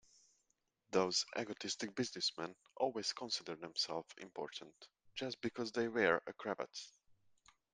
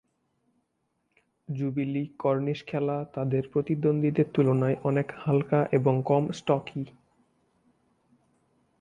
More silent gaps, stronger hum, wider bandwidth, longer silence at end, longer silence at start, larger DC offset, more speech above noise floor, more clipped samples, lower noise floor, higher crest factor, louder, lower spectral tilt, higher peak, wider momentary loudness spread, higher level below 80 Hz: neither; neither; first, 10 kHz vs 7.6 kHz; second, 0.85 s vs 1.9 s; second, 0.9 s vs 1.5 s; neither; second, 42 dB vs 50 dB; neither; first, -83 dBFS vs -77 dBFS; first, 24 dB vs 18 dB; second, -40 LUFS vs -27 LUFS; second, -3 dB/octave vs -8.5 dB/octave; second, -18 dBFS vs -10 dBFS; first, 14 LU vs 7 LU; second, -82 dBFS vs -66 dBFS